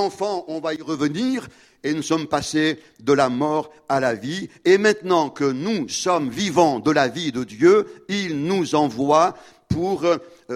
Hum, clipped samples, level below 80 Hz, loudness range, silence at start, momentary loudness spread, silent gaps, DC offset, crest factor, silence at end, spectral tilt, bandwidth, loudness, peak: none; under 0.1%; -54 dBFS; 3 LU; 0 s; 10 LU; none; under 0.1%; 18 dB; 0 s; -5 dB/octave; 13.5 kHz; -21 LUFS; -2 dBFS